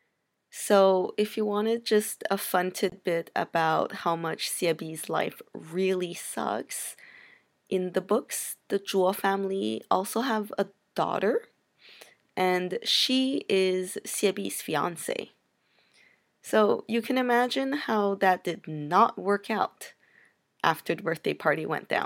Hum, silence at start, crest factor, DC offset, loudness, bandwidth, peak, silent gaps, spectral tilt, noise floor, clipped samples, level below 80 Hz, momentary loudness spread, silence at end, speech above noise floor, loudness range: none; 0.55 s; 24 dB; under 0.1%; -27 LUFS; 17 kHz; -6 dBFS; none; -4 dB/octave; -77 dBFS; under 0.1%; -80 dBFS; 9 LU; 0 s; 50 dB; 4 LU